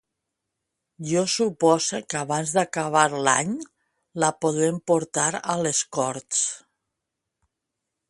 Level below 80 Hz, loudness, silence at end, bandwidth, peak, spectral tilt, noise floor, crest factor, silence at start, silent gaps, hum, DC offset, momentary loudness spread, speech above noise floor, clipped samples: -68 dBFS; -23 LUFS; 1.5 s; 11.5 kHz; -2 dBFS; -3.5 dB/octave; -83 dBFS; 24 dB; 1 s; none; none; under 0.1%; 9 LU; 60 dB; under 0.1%